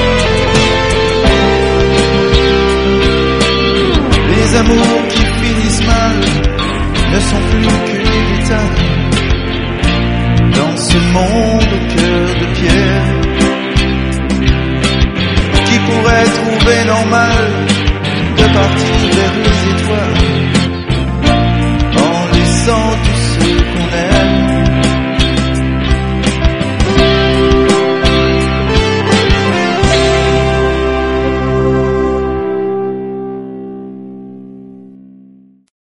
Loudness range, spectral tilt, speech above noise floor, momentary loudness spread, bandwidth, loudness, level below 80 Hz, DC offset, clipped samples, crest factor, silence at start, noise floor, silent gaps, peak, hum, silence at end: 2 LU; -5.5 dB/octave; 32 dB; 5 LU; 11.5 kHz; -11 LUFS; -18 dBFS; 0.8%; under 0.1%; 10 dB; 0 s; -42 dBFS; none; 0 dBFS; none; 1.05 s